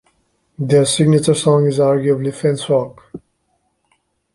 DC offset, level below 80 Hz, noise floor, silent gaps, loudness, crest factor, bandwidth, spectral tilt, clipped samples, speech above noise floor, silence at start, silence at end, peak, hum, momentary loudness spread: under 0.1%; -56 dBFS; -66 dBFS; none; -15 LUFS; 14 dB; 11.5 kHz; -6 dB/octave; under 0.1%; 51 dB; 0.6 s; 1.15 s; -2 dBFS; none; 6 LU